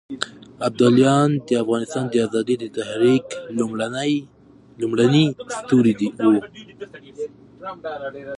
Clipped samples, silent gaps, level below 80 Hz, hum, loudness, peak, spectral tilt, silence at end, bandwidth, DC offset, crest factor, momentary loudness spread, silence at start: under 0.1%; none; -62 dBFS; none; -20 LUFS; -2 dBFS; -6 dB/octave; 0 s; 11 kHz; under 0.1%; 18 dB; 17 LU; 0.1 s